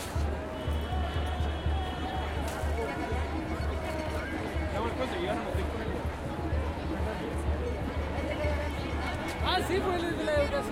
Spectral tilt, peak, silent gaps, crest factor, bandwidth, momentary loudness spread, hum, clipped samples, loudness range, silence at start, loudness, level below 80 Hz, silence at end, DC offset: -6 dB/octave; -14 dBFS; none; 16 dB; 16 kHz; 5 LU; none; under 0.1%; 2 LU; 0 s; -32 LUFS; -38 dBFS; 0 s; under 0.1%